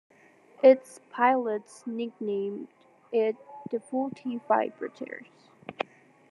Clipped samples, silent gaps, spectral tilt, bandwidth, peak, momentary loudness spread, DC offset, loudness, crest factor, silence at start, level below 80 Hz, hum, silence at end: under 0.1%; none; -5.5 dB/octave; 11.5 kHz; -8 dBFS; 20 LU; under 0.1%; -28 LUFS; 22 dB; 0.65 s; -88 dBFS; none; 0.5 s